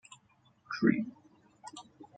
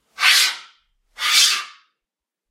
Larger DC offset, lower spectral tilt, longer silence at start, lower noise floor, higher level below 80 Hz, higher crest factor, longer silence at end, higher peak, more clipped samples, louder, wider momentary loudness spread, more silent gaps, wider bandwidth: neither; first, -6.5 dB/octave vs 6 dB/octave; first, 0.7 s vs 0.2 s; second, -67 dBFS vs -86 dBFS; about the same, -72 dBFS vs -72 dBFS; about the same, 26 dB vs 22 dB; second, 0.1 s vs 0.8 s; second, -10 dBFS vs 0 dBFS; neither; second, -32 LUFS vs -15 LUFS; first, 23 LU vs 18 LU; neither; second, 9.2 kHz vs 16 kHz